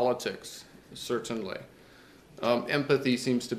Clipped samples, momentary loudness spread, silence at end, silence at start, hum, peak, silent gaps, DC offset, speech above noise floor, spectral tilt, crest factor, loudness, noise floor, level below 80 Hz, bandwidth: under 0.1%; 17 LU; 0 s; 0 s; none; -12 dBFS; none; under 0.1%; 25 dB; -5 dB/octave; 20 dB; -30 LUFS; -55 dBFS; -66 dBFS; 15.5 kHz